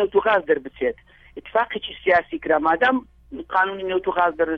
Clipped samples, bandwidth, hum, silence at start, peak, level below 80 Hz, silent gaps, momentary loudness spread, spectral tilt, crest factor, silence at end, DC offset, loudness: under 0.1%; 5.8 kHz; none; 0 s; -6 dBFS; -52 dBFS; none; 9 LU; -6.5 dB/octave; 16 dB; 0 s; under 0.1%; -21 LUFS